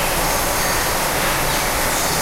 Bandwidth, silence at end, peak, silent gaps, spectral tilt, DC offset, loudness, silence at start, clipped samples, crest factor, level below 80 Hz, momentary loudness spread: 16 kHz; 0 s; -6 dBFS; none; -2 dB/octave; under 0.1%; -18 LUFS; 0 s; under 0.1%; 14 dB; -30 dBFS; 0 LU